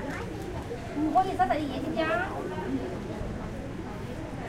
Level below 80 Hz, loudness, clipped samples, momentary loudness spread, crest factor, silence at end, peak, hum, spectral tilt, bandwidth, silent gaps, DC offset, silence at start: -44 dBFS; -31 LUFS; under 0.1%; 11 LU; 18 dB; 0 s; -12 dBFS; none; -6.5 dB/octave; 16 kHz; none; under 0.1%; 0 s